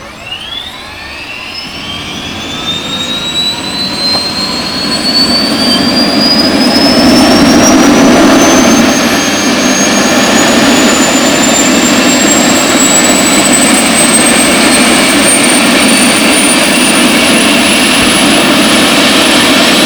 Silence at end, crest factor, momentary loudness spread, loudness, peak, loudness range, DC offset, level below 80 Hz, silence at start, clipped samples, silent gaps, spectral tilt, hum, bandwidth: 0 s; 8 dB; 13 LU; -6 LUFS; 0 dBFS; 7 LU; under 0.1%; -36 dBFS; 0 s; 4%; none; -2 dB/octave; none; over 20 kHz